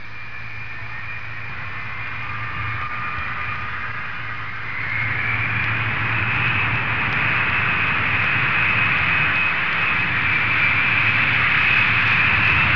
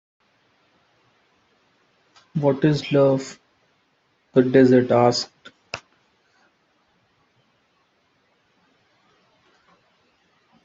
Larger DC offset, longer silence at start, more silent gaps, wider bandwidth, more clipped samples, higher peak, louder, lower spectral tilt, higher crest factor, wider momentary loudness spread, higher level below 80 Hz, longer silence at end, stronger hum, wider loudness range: first, 3% vs under 0.1%; second, 0 s vs 2.35 s; neither; second, 5.4 kHz vs 7.8 kHz; neither; about the same, -4 dBFS vs -2 dBFS; about the same, -18 LUFS vs -19 LUFS; about the same, -5.5 dB/octave vs -6.5 dB/octave; second, 16 dB vs 22 dB; second, 15 LU vs 21 LU; first, -44 dBFS vs -66 dBFS; second, 0 s vs 4.85 s; neither; first, 11 LU vs 6 LU